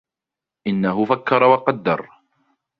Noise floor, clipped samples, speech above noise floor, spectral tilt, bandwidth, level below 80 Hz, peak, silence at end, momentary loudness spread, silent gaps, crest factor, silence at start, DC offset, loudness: -87 dBFS; under 0.1%; 69 dB; -9 dB/octave; 5.4 kHz; -62 dBFS; -2 dBFS; 0.75 s; 10 LU; none; 20 dB; 0.65 s; under 0.1%; -18 LUFS